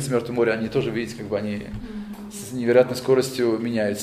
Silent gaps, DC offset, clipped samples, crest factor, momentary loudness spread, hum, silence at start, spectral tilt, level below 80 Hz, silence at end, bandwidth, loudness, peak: none; under 0.1%; under 0.1%; 20 dB; 16 LU; none; 0 s; -5.5 dB/octave; -50 dBFS; 0 s; 15.5 kHz; -23 LUFS; -4 dBFS